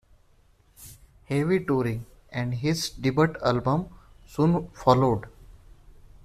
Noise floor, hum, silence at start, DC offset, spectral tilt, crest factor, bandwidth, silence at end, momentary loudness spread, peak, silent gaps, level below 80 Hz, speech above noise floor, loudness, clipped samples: -60 dBFS; none; 0.8 s; under 0.1%; -6.5 dB/octave; 22 dB; 14.5 kHz; 0.35 s; 16 LU; -4 dBFS; none; -50 dBFS; 35 dB; -25 LUFS; under 0.1%